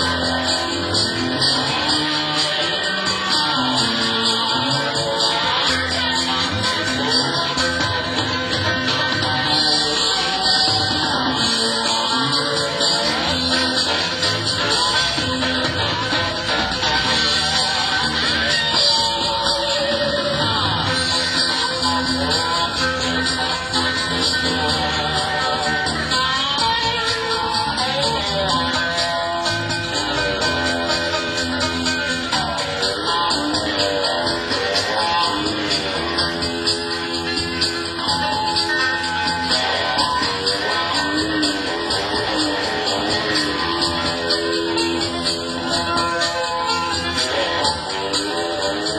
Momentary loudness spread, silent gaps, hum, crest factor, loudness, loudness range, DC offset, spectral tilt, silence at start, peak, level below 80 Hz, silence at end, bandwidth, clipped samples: 4 LU; none; none; 16 dB; -18 LUFS; 3 LU; under 0.1%; -2.5 dB/octave; 0 s; -4 dBFS; -40 dBFS; 0 s; 16 kHz; under 0.1%